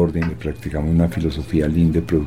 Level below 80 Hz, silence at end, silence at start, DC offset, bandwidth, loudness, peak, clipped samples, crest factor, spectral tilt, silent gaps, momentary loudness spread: -30 dBFS; 0 s; 0 s; 0.7%; 13 kHz; -20 LUFS; -4 dBFS; under 0.1%; 14 dB; -8.5 dB/octave; none; 7 LU